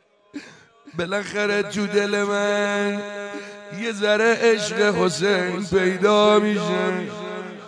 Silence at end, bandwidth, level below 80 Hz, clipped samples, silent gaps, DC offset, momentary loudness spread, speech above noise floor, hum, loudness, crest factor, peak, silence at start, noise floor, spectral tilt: 0 s; 10.5 kHz; -60 dBFS; under 0.1%; none; under 0.1%; 16 LU; 26 dB; none; -21 LUFS; 18 dB; -4 dBFS; 0.35 s; -47 dBFS; -4.5 dB/octave